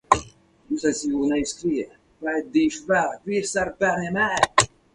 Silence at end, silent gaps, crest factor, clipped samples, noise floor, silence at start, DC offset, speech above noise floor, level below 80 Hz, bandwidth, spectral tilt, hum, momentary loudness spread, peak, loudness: 0.3 s; none; 24 dB; under 0.1%; -48 dBFS; 0.1 s; under 0.1%; 25 dB; -50 dBFS; 11.5 kHz; -3.5 dB/octave; none; 8 LU; 0 dBFS; -23 LUFS